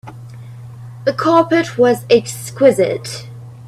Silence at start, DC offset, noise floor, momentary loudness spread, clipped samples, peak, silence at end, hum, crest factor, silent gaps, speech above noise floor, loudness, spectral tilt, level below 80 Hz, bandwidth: 0.05 s; under 0.1%; -33 dBFS; 22 LU; under 0.1%; 0 dBFS; 0 s; none; 16 dB; none; 19 dB; -14 LUFS; -5.5 dB/octave; -54 dBFS; 14 kHz